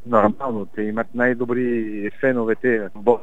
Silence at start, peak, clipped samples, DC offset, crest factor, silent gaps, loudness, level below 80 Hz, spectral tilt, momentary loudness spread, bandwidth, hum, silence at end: 0.05 s; 0 dBFS; under 0.1%; 2%; 20 dB; none; -21 LUFS; -62 dBFS; -9 dB/octave; 8 LU; 7.8 kHz; none; 0 s